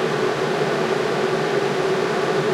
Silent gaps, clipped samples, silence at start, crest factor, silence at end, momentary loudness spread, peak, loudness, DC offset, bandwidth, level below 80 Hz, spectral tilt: none; under 0.1%; 0 s; 14 dB; 0 s; 1 LU; -6 dBFS; -21 LUFS; under 0.1%; 14 kHz; -60 dBFS; -5 dB/octave